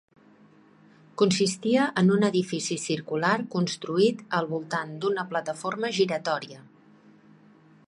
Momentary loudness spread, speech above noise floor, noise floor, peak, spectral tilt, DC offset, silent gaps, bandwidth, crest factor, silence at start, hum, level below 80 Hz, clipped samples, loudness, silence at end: 8 LU; 30 dB; -56 dBFS; -10 dBFS; -5 dB/octave; under 0.1%; none; 11.5 kHz; 18 dB; 1.2 s; none; -72 dBFS; under 0.1%; -26 LUFS; 1.25 s